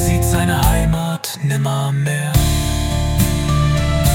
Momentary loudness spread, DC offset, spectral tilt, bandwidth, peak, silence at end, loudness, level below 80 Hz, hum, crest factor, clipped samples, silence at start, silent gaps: 4 LU; under 0.1%; -5 dB/octave; 17 kHz; 0 dBFS; 0 s; -17 LUFS; -22 dBFS; none; 14 dB; under 0.1%; 0 s; none